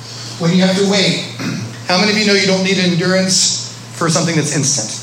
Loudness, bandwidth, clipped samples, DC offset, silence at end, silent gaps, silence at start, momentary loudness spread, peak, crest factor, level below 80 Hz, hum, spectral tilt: -14 LUFS; 15 kHz; under 0.1%; under 0.1%; 0 s; none; 0 s; 10 LU; 0 dBFS; 14 dB; -62 dBFS; none; -3.5 dB/octave